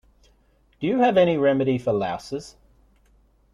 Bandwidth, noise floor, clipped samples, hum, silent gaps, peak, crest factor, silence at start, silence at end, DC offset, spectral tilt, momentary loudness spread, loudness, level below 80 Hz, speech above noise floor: 11 kHz; -61 dBFS; under 0.1%; none; none; -6 dBFS; 18 dB; 0.8 s; 1.05 s; under 0.1%; -7 dB/octave; 14 LU; -22 LUFS; -56 dBFS; 40 dB